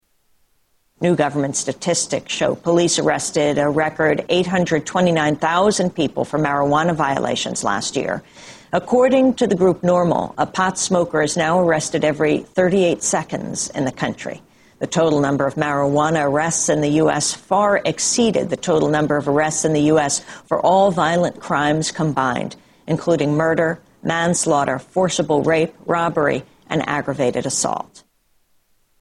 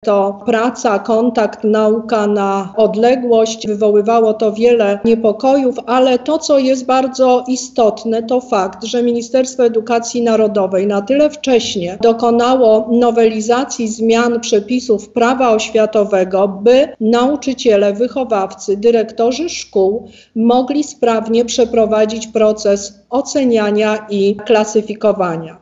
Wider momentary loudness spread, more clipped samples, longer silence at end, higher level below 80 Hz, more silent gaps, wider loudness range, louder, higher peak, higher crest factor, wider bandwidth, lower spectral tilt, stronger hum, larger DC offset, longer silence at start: about the same, 7 LU vs 5 LU; neither; first, 1.2 s vs 0.1 s; about the same, -52 dBFS vs -52 dBFS; neither; about the same, 3 LU vs 2 LU; second, -18 LUFS vs -14 LUFS; about the same, 0 dBFS vs -2 dBFS; first, 18 dB vs 12 dB; first, 12.5 kHz vs 8 kHz; about the same, -4.5 dB/octave vs -4.5 dB/octave; neither; neither; first, 1 s vs 0.05 s